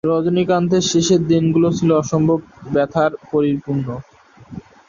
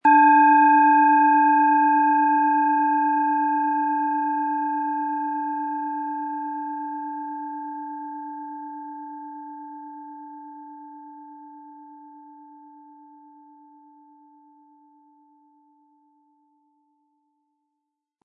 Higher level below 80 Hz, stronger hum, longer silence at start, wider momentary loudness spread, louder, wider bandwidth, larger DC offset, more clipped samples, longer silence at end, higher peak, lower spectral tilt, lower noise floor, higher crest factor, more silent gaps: first, -50 dBFS vs under -90 dBFS; neither; about the same, 0.05 s vs 0.05 s; second, 12 LU vs 25 LU; first, -17 LUFS vs -20 LUFS; first, 7.4 kHz vs 3.7 kHz; neither; neither; second, 0.3 s vs 6.15 s; about the same, -4 dBFS vs -6 dBFS; about the same, -6 dB/octave vs -6.5 dB/octave; second, -36 dBFS vs -82 dBFS; about the same, 14 dB vs 16 dB; neither